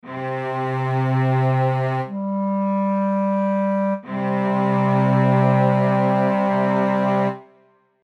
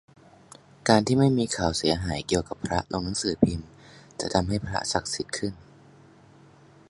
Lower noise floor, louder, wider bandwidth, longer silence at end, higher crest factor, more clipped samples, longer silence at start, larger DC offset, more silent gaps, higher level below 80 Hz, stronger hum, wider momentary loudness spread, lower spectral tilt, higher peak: first, -57 dBFS vs -53 dBFS; first, -20 LUFS vs -26 LUFS; second, 6 kHz vs 11.5 kHz; second, 0.65 s vs 1.35 s; second, 14 dB vs 26 dB; neither; second, 0.05 s vs 0.85 s; neither; neither; second, -74 dBFS vs -46 dBFS; neither; about the same, 8 LU vs 10 LU; first, -9.5 dB/octave vs -5 dB/octave; second, -6 dBFS vs -2 dBFS